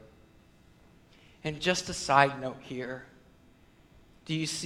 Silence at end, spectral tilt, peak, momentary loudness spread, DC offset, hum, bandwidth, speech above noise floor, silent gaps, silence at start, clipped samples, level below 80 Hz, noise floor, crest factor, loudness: 0 s; -3.5 dB/octave; -6 dBFS; 16 LU; under 0.1%; none; 16.5 kHz; 30 dB; none; 0.05 s; under 0.1%; -60 dBFS; -59 dBFS; 28 dB; -30 LUFS